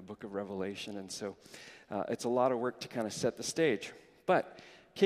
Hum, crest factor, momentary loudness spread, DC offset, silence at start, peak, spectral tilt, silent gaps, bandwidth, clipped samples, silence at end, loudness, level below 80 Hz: none; 22 dB; 17 LU; under 0.1%; 0 s; -12 dBFS; -4.5 dB/octave; none; 15.5 kHz; under 0.1%; 0 s; -35 LUFS; -74 dBFS